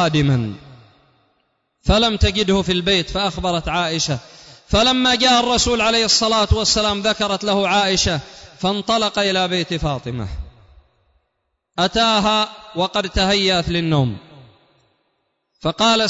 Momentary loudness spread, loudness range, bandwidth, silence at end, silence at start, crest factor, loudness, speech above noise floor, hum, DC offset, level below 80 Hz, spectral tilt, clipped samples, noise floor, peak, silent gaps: 12 LU; 6 LU; 8 kHz; 0 s; 0 s; 16 dB; -17 LUFS; 55 dB; none; under 0.1%; -34 dBFS; -4 dB/octave; under 0.1%; -73 dBFS; -2 dBFS; none